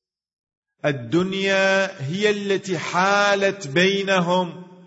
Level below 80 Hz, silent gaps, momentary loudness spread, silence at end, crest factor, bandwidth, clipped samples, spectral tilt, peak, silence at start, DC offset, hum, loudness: -66 dBFS; none; 8 LU; 0.15 s; 16 dB; 8 kHz; under 0.1%; -4.5 dB/octave; -6 dBFS; 0.85 s; under 0.1%; none; -20 LUFS